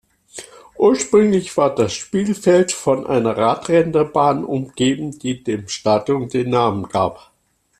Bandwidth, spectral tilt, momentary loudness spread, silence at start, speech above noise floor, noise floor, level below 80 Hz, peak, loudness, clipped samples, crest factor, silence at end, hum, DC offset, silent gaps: 13.5 kHz; -5.5 dB/octave; 9 LU; 0.35 s; 22 dB; -39 dBFS; -54 dBFS; -2 dBFS; -18 LUFS; under 0.1%; 16 dB; 0.65 s; none; under 0.1%; none